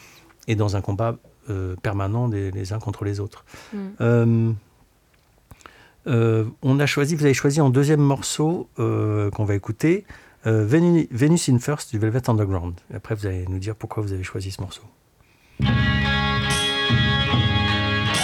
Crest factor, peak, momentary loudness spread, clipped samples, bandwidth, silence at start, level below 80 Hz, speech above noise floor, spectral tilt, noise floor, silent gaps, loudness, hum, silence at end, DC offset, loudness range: 16 dB; -6 dBFS; 12 LU; under 0.1%; 14.5 kHz; 0.45 s; -40 dBFS; 38 dB; -5.5 dB/octave; -59 dBFS; none; -22 LUFS; none; 0 s; under 0.1%; 6 LU